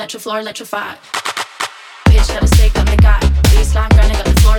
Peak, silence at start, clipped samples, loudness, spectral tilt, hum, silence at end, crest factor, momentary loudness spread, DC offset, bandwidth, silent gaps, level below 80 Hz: 0 dBFS; 0 s; under 0.1%; -14 LUFS; -5 dB/octave; none; 0 s; 12 dB; 11 LU; under 0.1%; 18.5 kHz; none; -12 dBFS